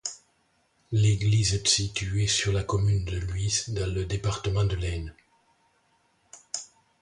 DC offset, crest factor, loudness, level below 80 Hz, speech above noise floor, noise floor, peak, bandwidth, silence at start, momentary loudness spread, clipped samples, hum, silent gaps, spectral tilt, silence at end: under 0.1%; 18 dB; -27 LUFS; -40 dBFS; 43 dB; -69 dBFS; -8 dBFS; 11.5 kHz; 0.05 s; 13 LU; under 0.1%; none; none; -4 dB/octave; 0.35 s